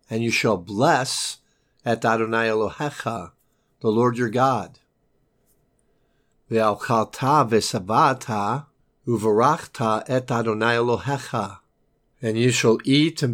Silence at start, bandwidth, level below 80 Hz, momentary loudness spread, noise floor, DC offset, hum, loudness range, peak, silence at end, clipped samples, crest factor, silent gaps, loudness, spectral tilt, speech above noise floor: 0.1 s; 17 kHz; -62 dBFS; 11 LU; -67 dBFS; under 0.1%; none; 4 LU; -4 dBFS; 0 s; under 0.1%; 18 dB; none; -22 LUFS; -5 dB/octave; 45 dB